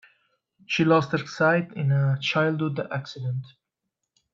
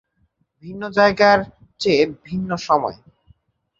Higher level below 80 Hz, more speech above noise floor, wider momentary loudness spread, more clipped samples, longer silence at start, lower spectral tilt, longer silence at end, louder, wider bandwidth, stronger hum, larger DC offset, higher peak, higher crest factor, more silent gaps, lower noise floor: second, -66 dBFS vs -54 dBFS; first, 59 dB vs 48 dB; second, 11 LU vs 16 LU; neither; about the same, 0.7 s vs 0.65 s; first, -6.5 dB/octave vs -5 dB/octave; about the same, 0.85 s vs 0.85 s; second, -24 LUFS vs -18 LUFS; about the same, 7.4 kHz vs 7.8 kHz; neither; neither; second, -6 dBFS vs -2 dBFS; about the same, 18 dB vs 20 dB; neither; first, -83 dBFS vs -66 dBFS